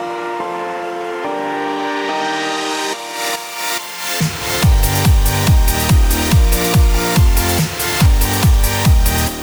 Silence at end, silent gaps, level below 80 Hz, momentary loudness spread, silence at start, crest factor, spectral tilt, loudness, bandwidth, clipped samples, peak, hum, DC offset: 0 s; none; -18 dBFS; 9 LU; 0 s; 14 dB; -4.5 dB/octave; -16 LUFS; over 20 kHz; under 0.1%; -2 dBFS; none; under 0.1%